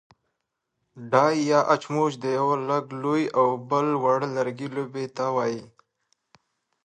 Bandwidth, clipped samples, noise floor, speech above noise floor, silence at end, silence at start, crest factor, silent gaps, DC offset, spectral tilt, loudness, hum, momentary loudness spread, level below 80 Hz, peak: 9.6 kHz; under 0.1%; -80 dBFS; 56 dB; 1.2 s; 0.95 s; 22 dB; none; under 0.1%; -6 dB/octave; -24 LUFS; none; 10 LU; -74 dBFS; -4 dBFS